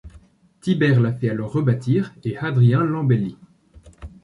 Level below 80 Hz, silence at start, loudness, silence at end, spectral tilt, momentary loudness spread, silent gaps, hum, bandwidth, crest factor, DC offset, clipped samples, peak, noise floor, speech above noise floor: -50 dBFS; 0.05 s; -20 LUFS; 0.15 s; -9 dB/octave; 10 LU; none; none; 10.5 kHz; 14 dB; under 0.1%; under 0.1%; -6 dBFS; -50 dBFS; 31 dB